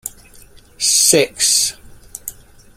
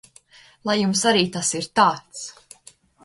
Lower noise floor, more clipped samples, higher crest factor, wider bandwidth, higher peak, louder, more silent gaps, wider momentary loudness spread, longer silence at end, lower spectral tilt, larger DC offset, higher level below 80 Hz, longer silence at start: second, -43 dBFS vs -52 dBFS; neither; about the same, 18 dB vs 20 dB; first, 16.5 kHz vs 11.5 kHz; first, 0 dBFS vs -4 dBFS; first, -13 LUFS vs -20 LUFS; neither; first, 21 LU vs 17 LU; second, 0.45 s vs 0.75 s; second, -1 dB/octave vs -3 dB/octave; neither; first, -48 dBFS vs -64 dBFS; second, 0.05 s vs 0.65 s